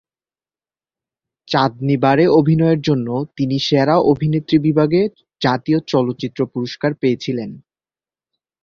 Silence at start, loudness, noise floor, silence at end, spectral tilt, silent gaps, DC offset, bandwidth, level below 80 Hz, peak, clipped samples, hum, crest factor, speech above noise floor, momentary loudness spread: 1.5 s; -17 LUFS; under -90 dBFS; 1.05 s; -7.5 dB/octave; none; under 0.1%; 7 kHz; -54 dBFS; -2 dBFS; under 0.1%; none; 16 dB; over 74 dB; 9 LU